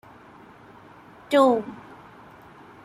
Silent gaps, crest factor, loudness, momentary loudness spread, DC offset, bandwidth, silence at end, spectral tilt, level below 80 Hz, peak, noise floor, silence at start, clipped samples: none; 20 dB; -21 LUFS; 27 LU; under 0.1%; 14.5 kHz; 1.1 s; -5 dB/octave; -66 dBFS; -6 dBFS; -49 dBFS; 1.3 s; under 0.1%